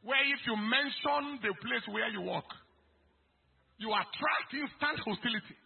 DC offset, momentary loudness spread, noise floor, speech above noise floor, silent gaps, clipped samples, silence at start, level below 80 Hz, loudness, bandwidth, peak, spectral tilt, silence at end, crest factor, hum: under 0.1%; 9 LU; -71 dBFS; 37 dB; none; under 0.1%; 0.05 s; -74 dBFS; -33 LUFS; 4.3 kHz; -14 dBFS; -1 dB/octave; 0.1 s; 20 dB; none